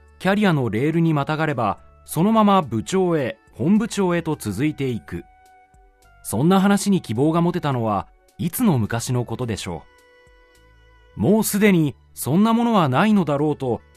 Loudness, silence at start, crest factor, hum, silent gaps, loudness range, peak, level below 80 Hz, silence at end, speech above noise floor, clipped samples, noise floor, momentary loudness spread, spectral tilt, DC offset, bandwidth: -20 LUFS; 0.2 s; 16 dB; none; none; 5 LU; -4 dBFS; -52 dBFS; 0.2 s; 33 dB; under 0.1%; -53 dBFS; 12 LU; -6 dB/octave; under 0.1%; 14 kHz